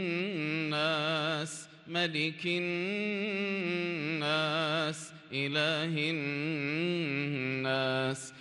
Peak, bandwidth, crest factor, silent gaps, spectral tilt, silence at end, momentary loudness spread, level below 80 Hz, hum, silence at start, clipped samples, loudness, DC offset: -18 dBFS; 12 kHz; 16 dB; none; -4.5 dB/octave; 0 s; 6 LU; -80 dBFS; none; 0 s; under 0.1%; -32 LUFS; under 0.1%